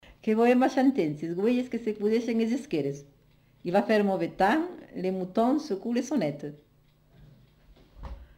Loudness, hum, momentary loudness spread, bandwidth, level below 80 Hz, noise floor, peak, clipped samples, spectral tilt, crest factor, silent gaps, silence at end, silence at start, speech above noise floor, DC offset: -27 LUFS; 50 Hz at -65 dBFS; 15 LU; 15.5 kHz; -56 dBFS; -61 dBFS; -12 dBFS; under 0.1%; -6.5 dB/octave; 16 dB; none; 0.15 s; 0.25 s; 35 dB; under 0.1%